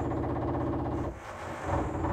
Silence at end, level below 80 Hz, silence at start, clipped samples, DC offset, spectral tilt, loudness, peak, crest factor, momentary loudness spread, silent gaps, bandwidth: 0 s; -44 dBFS; 0 s; under 0.1%; under 0.1%; -8 dB/octave; -33 LUFS; -18 dBFS; 14 dB; 7 LU; none; 14 kHz